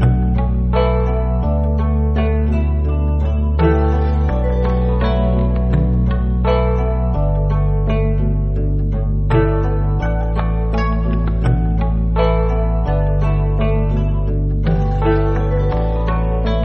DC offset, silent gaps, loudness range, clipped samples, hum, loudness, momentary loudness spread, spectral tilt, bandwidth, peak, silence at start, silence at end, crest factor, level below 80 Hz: under 0.1%; none; 1 LU; under 0.1%; none; -17 LUFS; 3 LU; -8 dB/octave; 5.4 kHz; -2 dBFS; 0 s; 0 s; 14 dB; -18 dBFS